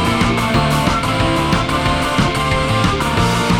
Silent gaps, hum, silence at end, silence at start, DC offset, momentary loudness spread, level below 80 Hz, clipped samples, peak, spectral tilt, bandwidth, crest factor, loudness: none; none; 0 s; 0 s; under 0.1%; 1 LU; -28 dBFS; under 0.1%; -2 dBFS; -5 dB/octave; 19 kHz; 14 dB; -15 LUFS